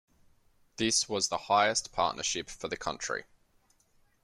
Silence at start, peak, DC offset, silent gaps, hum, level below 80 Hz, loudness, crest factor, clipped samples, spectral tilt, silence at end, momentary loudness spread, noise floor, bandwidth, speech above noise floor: 0.8 s; -12 dBFS; under 0.1%; none; none; -62 dBFS; -30 LUFS; 22 dB; under 0.1%; -1.5 dB/octave; 1 s; 11 LU; -68 dBFS; 13.5 kHz; 38 dB